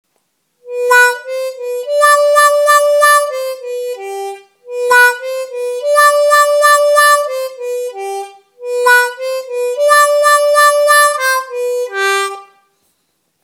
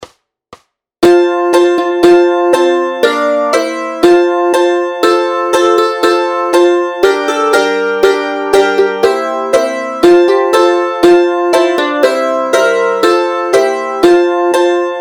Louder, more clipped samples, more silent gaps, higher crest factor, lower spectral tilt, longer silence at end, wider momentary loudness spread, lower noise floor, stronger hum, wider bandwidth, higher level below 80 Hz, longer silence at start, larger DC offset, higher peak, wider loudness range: about the same, -11 LUFS vs -10 LUFS; second, under 0.1% vs 0.3%; neither; about the same, 12 dB vs 10 dB; second, 2.5 dB/octave vs -3.5 dB/octave; first, 1 s vs 0 s; first, 14 LU vs 4 LU; first, -64 dBFS vs -41 dBFS; neither; first, 19.5 kHz vs 17 kHz; second, -78 dBFS vs -50 dBFS; first, 0.65 s vs 0 s; neither; about the same, 0 dBFS vs 0 dBFS; about the same, 3 LU vs 1 LU